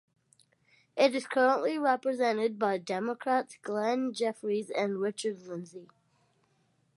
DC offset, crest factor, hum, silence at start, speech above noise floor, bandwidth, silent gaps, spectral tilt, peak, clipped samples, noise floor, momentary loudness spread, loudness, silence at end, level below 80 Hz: under 0.1%; 20 dB; none; 0.95 s; 42 dB; 11.5 kHz; none; -4.5 dB/octave; -12 dBFS; under 0.1%; -72 dBFS; 10 LU; -30 LUFS; 1.1 s; -86 dBFS